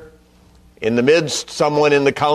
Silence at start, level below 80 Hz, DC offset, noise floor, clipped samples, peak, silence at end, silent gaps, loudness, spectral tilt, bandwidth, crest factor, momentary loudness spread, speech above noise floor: 0 s; -52 dBFS; under 0.1%; -49 dBFS; under 0.1%; -2 dBFS; 0 s; none; -16 LUFS; -4.5 dB/octave; 13 kHz; 14 dB; 7 LU; 34 dB